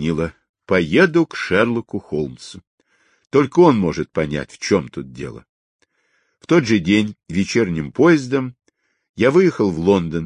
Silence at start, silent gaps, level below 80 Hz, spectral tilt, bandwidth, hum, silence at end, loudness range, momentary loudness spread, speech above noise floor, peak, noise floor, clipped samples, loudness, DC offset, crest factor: 0 s; 0.49-0.54 s, 2.67-2.78 s, 5.49-5.79 s, 9.09-9.14 s; -46 dBFS; -6.5 dB/octave; 10.5 kHz; none; 0 s; 3 LU; 16 LU; 48 dB; -2 dBFS; -65 dBFS; under 0.1%; -18 LUFS; under 0.1%; 16 dB